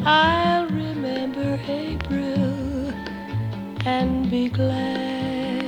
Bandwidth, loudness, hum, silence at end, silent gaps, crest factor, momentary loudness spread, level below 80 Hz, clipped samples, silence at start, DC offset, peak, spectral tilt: 11 kHz; -24 LUFS; none; 0 s; none; 18 dB; 9 LU; -42 dBFS; under 0.1%; 0 s; under 0.1%; -4 dBFS; -7 dB/octave